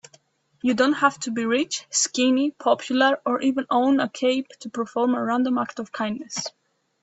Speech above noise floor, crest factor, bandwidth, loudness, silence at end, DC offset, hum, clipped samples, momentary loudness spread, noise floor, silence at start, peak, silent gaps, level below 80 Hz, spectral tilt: 37 dB; 18 dB; 8.4 kHz; -23 LUFS; 0.55 s; under 0.1%; none; under 0.1%; 9 LU; -59 dBFS; 0.65 s; -6 dBFS; none; -68 dBFS; -2.5 dB/octave